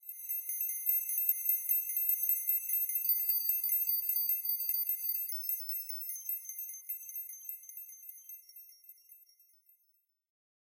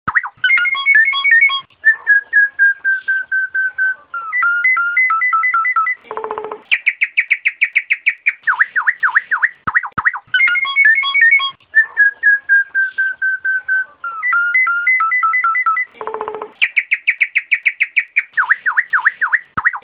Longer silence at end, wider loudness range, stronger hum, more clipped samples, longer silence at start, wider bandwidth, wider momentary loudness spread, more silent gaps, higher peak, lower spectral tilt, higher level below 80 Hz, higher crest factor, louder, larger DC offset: first, 1.5 s vs 0.05 s; first, 16 LU vs 3 LU; neither; neither; about the same, 0.05 s vs 0.05 s; first, 16.5 kHz vs 5 kHz; first, 17 LU vs 8 LU; neither; second, -14 dBFS vs 0 dBFS; second, 9.5 dB/octave vs -4.5 dB/octave; second, under -90 dBFS vs -60 dBFS; first, 22 dB vs 14 dB; second, -31 LUFS vs -13 LUFS; neither